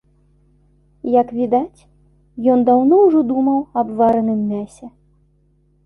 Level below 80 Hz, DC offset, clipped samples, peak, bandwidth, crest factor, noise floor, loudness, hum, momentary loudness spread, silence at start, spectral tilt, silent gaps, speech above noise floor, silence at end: -54 dBFS; under 0.1%; under 0.1%; -2 dBFS; 10.5 kHz; 14 dB; -58 dBFS; -16 LUFS; 50 Hz at -50 dBFS; 16 LU; 1.05 s; -9.5 dB/octave; none; 42 dB; 1 s